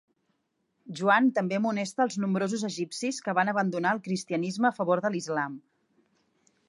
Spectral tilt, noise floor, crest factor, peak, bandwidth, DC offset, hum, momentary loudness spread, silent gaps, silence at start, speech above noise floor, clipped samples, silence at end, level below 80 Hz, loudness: -5 dB/octave; -76 dBFS; 20 dB; -10 dBFS; 11.5 kHz; under 0.1%; none; 8 LU; none; 0.85 s; 49 dB; under 0.1%; 1.1 s; -80 dBFS; -28 LUFS